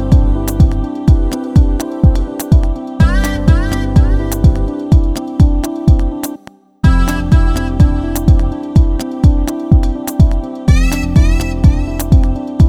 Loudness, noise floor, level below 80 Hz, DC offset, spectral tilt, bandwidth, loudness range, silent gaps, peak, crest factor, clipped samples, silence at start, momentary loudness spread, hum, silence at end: -13 LUFS; -36 dBFS; -14 dBFS; under 0.1%; -7 dB/octave; 18 kHz; 1 LU; none; 0 dBFS; 10 dB; under 0.1%; 0 s; 4 LU; none; 0 s